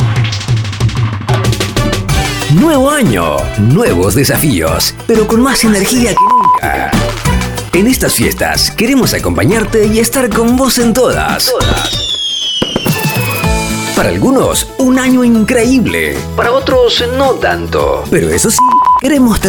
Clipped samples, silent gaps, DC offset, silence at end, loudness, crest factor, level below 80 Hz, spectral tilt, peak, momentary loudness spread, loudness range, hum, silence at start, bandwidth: under 0.1%; none; under 0.1%; 0 s; -10 LUFS; 10 dB; -24 dBFS; -4.5 dB/octave; 0 dBFS; 5 LU; 2 LU; none; 0 s; over 20 kHz